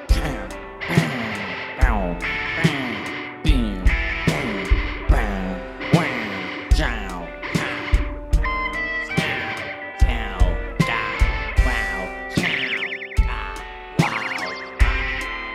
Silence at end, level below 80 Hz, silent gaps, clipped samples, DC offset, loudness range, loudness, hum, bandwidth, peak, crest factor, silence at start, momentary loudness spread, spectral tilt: 0 s; -24 dBFS; none; under 0.1%; under 0.1%; 1 LU; -23 LUFS; none; 13 kHz; -2 dBFS; 20 dB; 0 s; 7 LU; -5.5 dB/octave